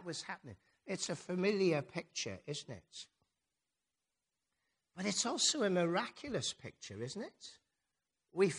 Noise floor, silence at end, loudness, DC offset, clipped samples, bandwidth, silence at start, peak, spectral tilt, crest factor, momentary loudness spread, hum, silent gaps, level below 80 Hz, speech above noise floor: under -90 dBFS; 0 s; -37 LUFS; under 0.1%; under 0.1%; 10.5 kHz; 0 s; -18 dBFS; -3.5 dB/octave; 22 dB; 20 LU; none; none; -78 dBFS; over 52 dB